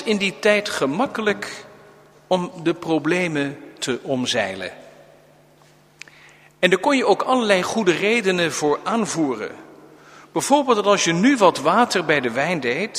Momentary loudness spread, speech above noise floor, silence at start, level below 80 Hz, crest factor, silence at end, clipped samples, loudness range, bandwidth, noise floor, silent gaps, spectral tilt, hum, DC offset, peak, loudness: 10 LU; 33 dB; 0 s; -64 dBFS; 20 dB; 0 s; under 0.1%; 6 LU; 15.5 kHz; -53 dBFS; none; -4 dB/octave; none; under 0.1%; 0 dBFS; -20 LUFS